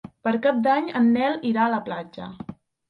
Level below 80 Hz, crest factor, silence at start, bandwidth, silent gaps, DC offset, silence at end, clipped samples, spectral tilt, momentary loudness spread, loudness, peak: -64 dBFS; 16 dB; 0.25 s; 5.2 kHz; none; under 0.1%; 0.35 s; under 0.1%; -8 dB/octave; 17 LU; -22 LUFS; -8 dBFS